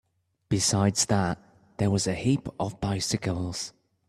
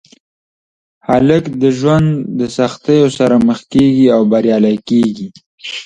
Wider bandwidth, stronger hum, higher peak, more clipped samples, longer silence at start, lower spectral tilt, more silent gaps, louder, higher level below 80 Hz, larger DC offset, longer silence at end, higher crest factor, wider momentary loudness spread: first, 13.5 kHz vs 10 kHz; neither; second, -10 dBFS vs 0 dBFS; neither; second, 0.5 s vs 1.1 s; second, -4.5 dB/octave vs -7 dB/octave; second, none vs 5.46-5.58 s; second, -27 LUFS vs -12 LUFS; second, -54 dBFS vs -46 dBFS; neither; first, 0.4 s vs 0 s; first, 18 dB vs 12 dB; about the same, 10 LU vs 10 LU